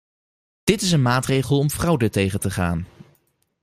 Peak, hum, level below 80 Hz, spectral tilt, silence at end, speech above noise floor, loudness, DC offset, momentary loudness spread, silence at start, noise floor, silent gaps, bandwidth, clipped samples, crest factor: -2 dBFS; none; -46 dBFS; -5.5 dB/octave; 0.75 s; 45 dB; -21 LUFS; under 0.1%; 7 LU; 0.65 s; -65 dBFS; none; 15.5 kHz; under 0.1%; 20 dB